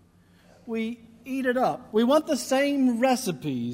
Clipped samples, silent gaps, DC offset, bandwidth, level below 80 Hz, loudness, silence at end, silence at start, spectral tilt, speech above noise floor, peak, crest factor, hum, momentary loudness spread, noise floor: under 0.1%; none; under 0.1%; 16 kHz; -66 dBFS; -25 LUFS; 0 s; 0.65 s; -4.5 dB/octave; 33 dB; -10 dBFS; 16 dB; none; 12 LU; -57 dBFS